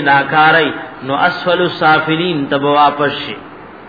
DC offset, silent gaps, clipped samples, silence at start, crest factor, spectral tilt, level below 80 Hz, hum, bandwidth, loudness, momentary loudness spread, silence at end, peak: 0.2%; none; under 0.1%; 0 s; 12 dB; -7 dB/octave; -54 dBFS; none; 5 kHz; -13 LUFS; 12 LU; 0 s; 0 dBFS